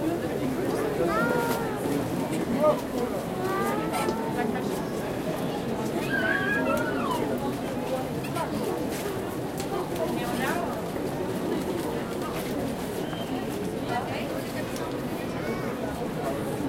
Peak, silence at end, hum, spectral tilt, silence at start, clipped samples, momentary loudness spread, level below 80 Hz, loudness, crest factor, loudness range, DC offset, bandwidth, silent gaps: -10 dBFS; 0 s; none; -5.5 dB/octave; 0 s; under 0.1%; 6 LU; -50 dBFS; -29 LUFS; 18 dB; 4 LU; under 0.1%; 16 kHz; none